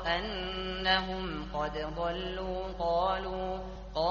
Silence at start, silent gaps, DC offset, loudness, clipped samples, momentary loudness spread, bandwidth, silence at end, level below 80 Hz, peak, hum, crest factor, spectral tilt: 0 s; none; under 0.1%; -33 LUFS; under 0.1%; 8 LU; 7 kHz; 0 s; -44 dBFS; -12 dBFS; none; 20 dB; -2 dB/octave